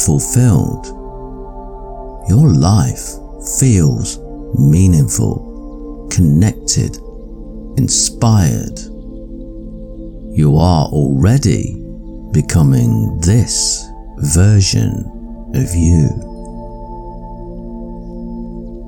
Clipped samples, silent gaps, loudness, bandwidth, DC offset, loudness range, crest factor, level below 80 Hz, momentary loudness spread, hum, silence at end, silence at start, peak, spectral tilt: under 0.1%; none; -13 LUFS; 18.5 kHz; under 0.1%; 4 LU; 14 dB; -28 dBFS; 20 LU; none; 0 s; 0 s; 0 dBFS; -5.5 dB/octave